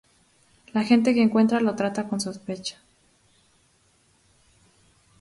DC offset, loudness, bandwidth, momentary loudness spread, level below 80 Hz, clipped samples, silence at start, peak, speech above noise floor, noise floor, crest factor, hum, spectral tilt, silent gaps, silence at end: under 0.1%; -23 LUFS; 11.5 kHz; 13 LU; -66 dBFS; under 0.1%; 0.75 s; -4 dBFS; 41 dB; -63 dBFS; 22 dB; none; -5.5 dB/octave; none; 2.5 s